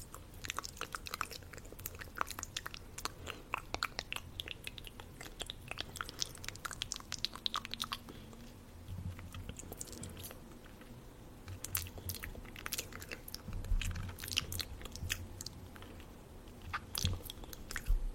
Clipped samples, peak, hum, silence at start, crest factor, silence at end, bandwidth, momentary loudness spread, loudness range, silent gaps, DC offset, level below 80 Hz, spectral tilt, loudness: under 0.1%; -10 dBFS; none; 0 s; 32 dB; 0 s; 16.5 kHz; 14 LU; 4 LU; none; under 0.1%; -48 dBFS; -2.5 dB/octave; -43 LUFS